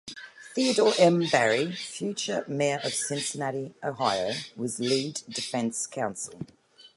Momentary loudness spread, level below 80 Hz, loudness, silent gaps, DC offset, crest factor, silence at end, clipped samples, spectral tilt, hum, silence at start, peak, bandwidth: 13 LU; -72 dBFS; -27 LUFS; none; under 0.1%; 22 dB; 0.1 s; under 0.1%; -3.5 dB/octave; none; 0.05 s; -6 dBFS; 11.5 kHz